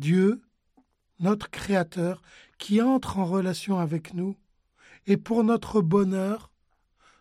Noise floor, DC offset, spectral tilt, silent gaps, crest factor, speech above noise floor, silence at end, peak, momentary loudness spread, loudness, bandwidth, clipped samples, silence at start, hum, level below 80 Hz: -69 dBFS; under 0.1%; -7 dB/octave; none; 16 dB; 45 dB; 0.75 s; -10 dBFS; 12 LU; -26 LUFS; 13.5 kHz; under 0.1%; 0 s; none; -58 dBFS